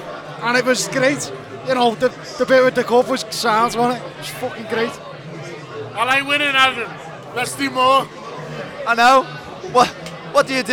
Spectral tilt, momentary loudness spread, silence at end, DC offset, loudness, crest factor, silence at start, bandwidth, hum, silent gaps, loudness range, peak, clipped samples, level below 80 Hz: -3 dB/octave; 17 LU; 0 s; under 0.1%; -17 LUFS; 18 dB; 0 s; 18.5 kHz; none; none; 3 LU; -2 dBFS; under 0.1%; -56 dBFS